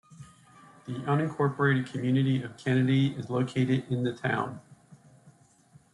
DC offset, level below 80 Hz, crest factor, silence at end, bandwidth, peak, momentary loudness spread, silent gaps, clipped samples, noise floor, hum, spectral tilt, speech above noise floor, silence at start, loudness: under 0.1%; -66 dBFS; 18 dB; 0.65 s; 11 kHz; -12 dBFS; 11 LU; none; under 0.1%; -59 dBFS; none; -7.5 dB/octave; 32 dB; 0.1 s; -28 LUFS